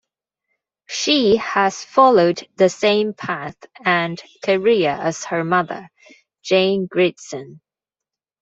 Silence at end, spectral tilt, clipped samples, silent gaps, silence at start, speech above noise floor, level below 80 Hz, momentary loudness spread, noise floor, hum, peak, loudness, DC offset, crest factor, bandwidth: 0.85 s; -4.5 dB/octave; under 0.1%; none; 0.9 s; 69 dB; -60 dBFS; 14 LU; -87 dBFS; none; -2 dBFS; -18 LUFS; under 0.1%; 18 dB; 8 kHz